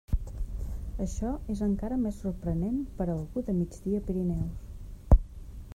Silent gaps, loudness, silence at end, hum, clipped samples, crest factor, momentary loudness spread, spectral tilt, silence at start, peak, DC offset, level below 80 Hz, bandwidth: none; -32 LUFS; 0 s; none; under 0.1%; 22 dB; 13 LU; -9 dB/octave; 0.1 s; -6 dBFS; under 0.1%; -34 dBFS; 13 kHz